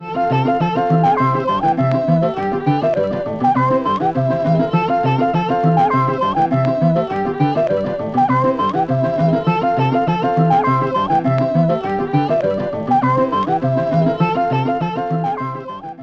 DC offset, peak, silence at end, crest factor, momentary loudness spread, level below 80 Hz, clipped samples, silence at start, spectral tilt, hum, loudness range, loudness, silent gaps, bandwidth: under 0.1%; -4 dBFS; 0 s; 12 dB; 5 LU; -48 dBFS; under 0.1%; 0 s; -9 dB/octave; none; 1 LU; -17 LUFS; none; 6.6 kHz